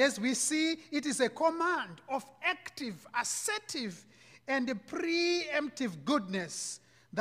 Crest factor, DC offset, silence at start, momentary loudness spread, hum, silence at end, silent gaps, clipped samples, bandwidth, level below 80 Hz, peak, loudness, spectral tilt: 20 dB; under 0.1%; 0 s; 11 LU; none; 0 s; none; under 0.1%; 15.5 kHz; -78 dBFS; -14 dBFS; -33 LUFS; -2.5 dB/octave